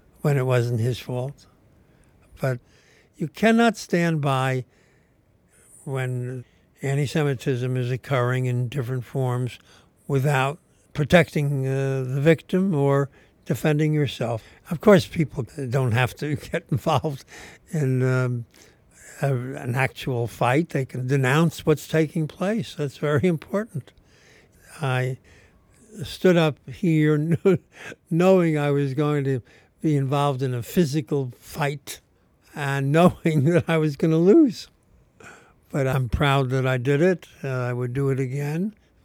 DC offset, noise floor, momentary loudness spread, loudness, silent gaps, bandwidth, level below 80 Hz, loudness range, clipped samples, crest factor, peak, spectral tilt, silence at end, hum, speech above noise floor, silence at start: under 0.1%; -61 dBFS; 13 LU; -23 LUFS; none; 17.5 kHz; -52 dBFS; 5 LU; under 0.1%; 20 dB; -2 dBFS; -7 dB/octave; 0.35 s; none; 38 dB; 0.25 s